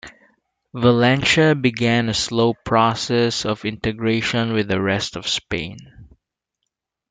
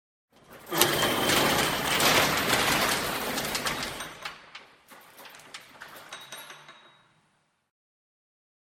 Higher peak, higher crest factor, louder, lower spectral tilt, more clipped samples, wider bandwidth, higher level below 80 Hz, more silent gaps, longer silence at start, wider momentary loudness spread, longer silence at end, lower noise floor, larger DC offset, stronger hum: about the same, -2 dBFS vs -2 dBFS; second, 18 dB vs 28 dB; first, -19 LUFS vs -25 LUFS; first, -5 dB/octave vs -2 dB/octave; neither; second, 9.4 kHz vs 17.5 kHz; about the same, -50 dBFS vs -54 dBFS; neither; second, 0.05 s vs 0.5 s; second, 9 LU vs 23 LU; second, 1.05 s vs 2 s; first, -79 dBFS vs -71 dBFS; neither; neither